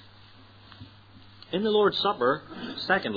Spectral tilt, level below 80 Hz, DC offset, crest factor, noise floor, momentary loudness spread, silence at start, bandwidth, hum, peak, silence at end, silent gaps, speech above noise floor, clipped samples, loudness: -6.5 dB/octave; -64 dBFS; under 0.1%; 20 dB; -52 dBFS; 18 LU; 0.7 s; 5 kHz; none; -8 dBFS; 0 s; none; 26 dB; under 0.1%; -26 LUFS